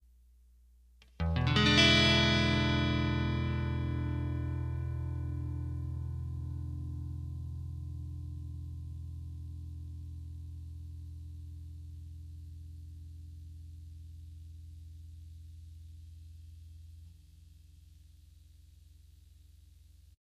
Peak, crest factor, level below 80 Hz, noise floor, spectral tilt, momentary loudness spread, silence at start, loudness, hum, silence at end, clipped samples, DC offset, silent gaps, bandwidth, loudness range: -10 dBFS; 26 dB; -46 dBFS; -61 dBFS; -5 dB/octave; 24 LU; 1.2 s; -32 LUFS; none; 0.15 s; under 0.1%; under 0.1%; none; 11 kHz; 24 LU